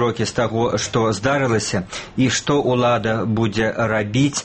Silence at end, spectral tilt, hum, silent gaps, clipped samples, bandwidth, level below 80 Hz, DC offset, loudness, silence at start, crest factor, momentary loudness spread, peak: 0 s; -5 dB/octave; none; none; under 0.1%; 8.8 kHz; -46 dBFS; under 0.1%; -19 LUFS; 0 s; 14 dB; 4 LU; -4 dBFS